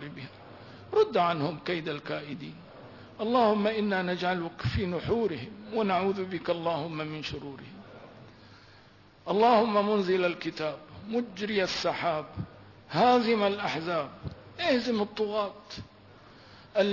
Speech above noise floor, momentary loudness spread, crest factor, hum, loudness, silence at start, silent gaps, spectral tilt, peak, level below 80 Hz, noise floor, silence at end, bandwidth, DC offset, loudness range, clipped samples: 28 dB; 20 LU; 18 dB; none; -29 LUFS; 0 s; none; -6 dB/octave; -12 dBFS; -58 dBFS; -56 dBFS; 0 s; 6 kHz; under 0.1%; 4 LU; under 0.1%